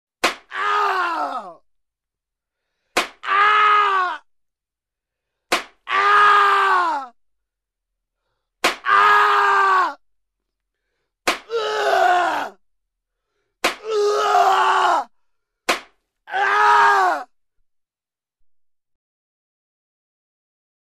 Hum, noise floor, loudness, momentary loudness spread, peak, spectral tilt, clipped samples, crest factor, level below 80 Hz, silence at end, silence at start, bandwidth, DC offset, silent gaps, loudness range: none; under -90 dBFS; -17 LUFS; 12 LU; -4 dBFS; -0.5 dB/octave; under 0.1%; 16 dB; -64 dBFS; 3.7 s; 0.25 s; 14 kHz; under 0.1%; none; 5 LU